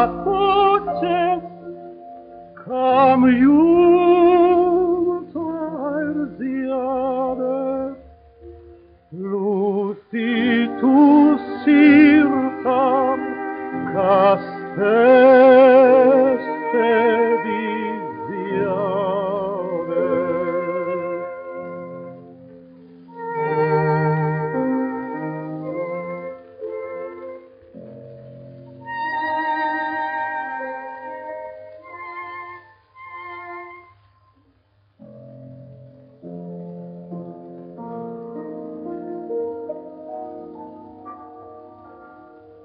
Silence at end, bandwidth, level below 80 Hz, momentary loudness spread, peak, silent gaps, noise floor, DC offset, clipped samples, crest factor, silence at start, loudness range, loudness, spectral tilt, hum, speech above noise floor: 0.6 s; 5.2 kHz; -56 dBFS; 23 LU; -2 dBFS; none; -60 dBFS; under 0.1%; under 0.1%; 18 dB; 0 s; 21 LU; -18 LUFS; -5.5 dB/octave; none; 47 dB